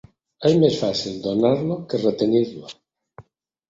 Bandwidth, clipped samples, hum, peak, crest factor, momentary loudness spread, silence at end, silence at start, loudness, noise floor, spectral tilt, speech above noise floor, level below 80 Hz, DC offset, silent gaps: 7.8 kHz; under 0.1%; none; -4 dBFS; 18 dB; 9 LU; 0.5 s; 0.4 s; -21 LUFS; -52 dBFS; -6.5 dB/octave; 32 dB; -60 dBFS; under 0.1%; none